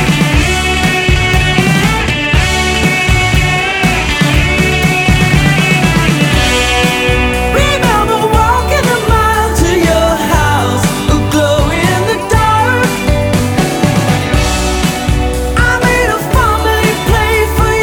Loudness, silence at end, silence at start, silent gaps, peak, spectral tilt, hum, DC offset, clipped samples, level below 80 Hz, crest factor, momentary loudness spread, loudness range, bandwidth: -10 LUFS; 0 s; 0 s; none; 0 dBFS; -4.5 dB/octave; none; under 0.1%; under 0.1%; -18 dBFS; 10 dB; 3 LU; 2 LU; 19 kHz